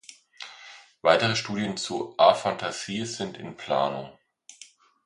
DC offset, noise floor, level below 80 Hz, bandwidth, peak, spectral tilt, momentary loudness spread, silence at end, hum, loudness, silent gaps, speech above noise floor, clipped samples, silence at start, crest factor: under 0.1%; -53 dBFS; -66 dBFS; 11.5 kHz; -4 dBFS; -4 dB/octave; 24 LU; 0.4 s; none; -25 LUFS; none; 27 dB; under 0.1%; 0.1 s; 24 dB